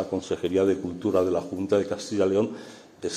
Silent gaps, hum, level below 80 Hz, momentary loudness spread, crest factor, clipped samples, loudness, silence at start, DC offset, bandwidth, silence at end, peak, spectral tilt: none; none; -62 dBFS; 9 LU; 16 dB; under 0.1%; -26 LUFS; 0 s; under 0.1%; 13 kHz; 0 s; -10 dBFS; -6 dB/octave